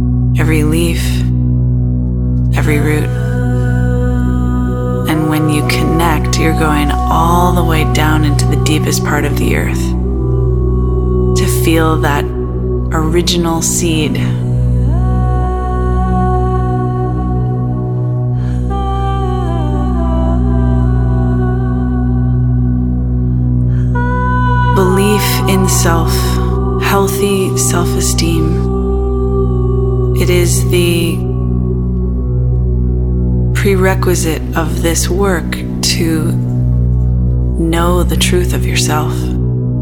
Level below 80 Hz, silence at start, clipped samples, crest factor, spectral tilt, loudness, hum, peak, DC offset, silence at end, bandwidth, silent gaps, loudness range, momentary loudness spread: -18 dBFS; 0 s; under 0.1%; 12 dB; -5.5 dB/octave; -13 LUFS; none; 0 dBFS; under 0.1%; 0 s; 18 kHz; none; 2 LU; 4 LU